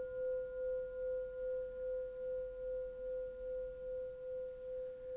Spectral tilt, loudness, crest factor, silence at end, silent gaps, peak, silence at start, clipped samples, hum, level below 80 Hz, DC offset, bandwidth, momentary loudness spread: -6 dB/octave; -43 LUFS; 8 dB; 0 s; none; -34 dBFS; 0 s; under 0.1%; none; -62 dBFS; under 0.1%; 3.8 kHz; 4 LU